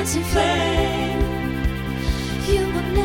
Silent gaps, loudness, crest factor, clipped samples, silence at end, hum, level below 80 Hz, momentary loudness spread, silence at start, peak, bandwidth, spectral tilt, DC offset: none; -22 LUFS; 14 dB; under 0.1%; 0 s; none; -28 dBFS; 6 LU; 0 s; -6 dBFS; 17.5 kHz; -5 dB/octave; under 0.1%